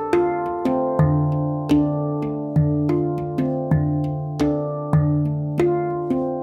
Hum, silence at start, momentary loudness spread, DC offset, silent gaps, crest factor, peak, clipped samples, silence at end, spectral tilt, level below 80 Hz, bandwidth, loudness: none; 0 s; 5 LU; under 0.1%; none; 16 dB; -4 dBFS; under 0.1%; 0 s; -9.5 dB/octave; -46 dBFS; 7.2 kHz; -21 LUFS